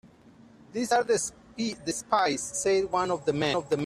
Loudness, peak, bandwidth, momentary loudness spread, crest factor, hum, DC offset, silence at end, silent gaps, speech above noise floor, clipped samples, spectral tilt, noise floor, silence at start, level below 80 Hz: -28 LUFS; -10 dBFS; 14 kHz; 9 LU; 18 dB; none; under 0.1%; 0 s; none; 27 dB; under 0.1%; -3.5 dB/octave; -54 dBFS; 0.75 s; -62 dBFS